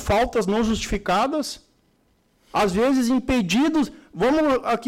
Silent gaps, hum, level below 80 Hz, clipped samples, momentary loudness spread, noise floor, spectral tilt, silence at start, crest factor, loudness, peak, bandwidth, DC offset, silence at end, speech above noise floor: none; none; -40 dBFS; under 0.1%; 8 LU; -63 dBFS; -5 dB/octave; 0 s; 8 dB; -22 LUFS; -14 dBFS; 16 kHz; under 0.1%; 0 s; 43 dB